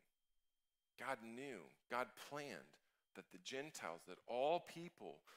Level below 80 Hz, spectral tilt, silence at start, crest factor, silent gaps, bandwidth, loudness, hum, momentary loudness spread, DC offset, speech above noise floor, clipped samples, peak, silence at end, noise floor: under -90 dBFS; -3.5 dB/octave; 1 s; 22 dB; none; 16 kHz; -48 LUFS; none; 16 LU; under 0.1%; over 41 dB; under 0.1%; -28 dBFS; 0 s; under -90 dBFS